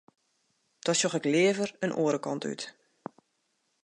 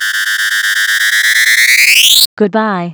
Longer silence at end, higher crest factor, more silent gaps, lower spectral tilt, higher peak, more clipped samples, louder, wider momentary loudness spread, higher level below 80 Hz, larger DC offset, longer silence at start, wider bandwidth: first, 1.15 s vs 0 s; first, 18 dB vs 10 dB; second, none vs 2.26-2.37 s; first, -4 dB/octave vs -0.5 dB/octave; second, -12 dBFS vs 0 dBFS; neither; second, -28 LUFS vs -7 LUFS; first, 22 LU vs 8 LU; second, -82 dBFS vs -60 dBFS; second, under 0.1% vs 0.3%; first, 0.85 s vs 0 s; second, 11.5 kHz vs over 20 kHz